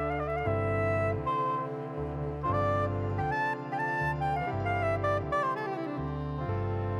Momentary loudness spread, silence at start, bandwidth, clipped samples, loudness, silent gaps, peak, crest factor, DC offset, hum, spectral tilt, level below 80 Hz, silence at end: 6 LU; 0 s; 9.8 kHz; under 0.1%; -31 LUFS; none; -18 dBFS; 12 dB; under 0.1%; none; -8 dB/octave; -48 dBFS; 0 s